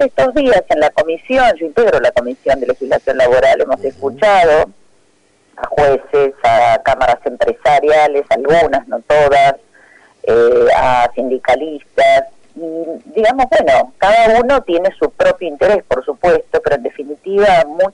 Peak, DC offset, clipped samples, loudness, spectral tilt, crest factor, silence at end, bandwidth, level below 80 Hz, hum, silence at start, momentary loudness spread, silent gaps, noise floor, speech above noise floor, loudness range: -6 dBFS; under 0.1%; under 0.1%; -12 LUFS; -5 dB/octave; 8 dB; 0.05 s; 11 kHz; -40 dBFS; none; 0 s; 9 LU; none; -54 dBFS; 42 dB; 2 LU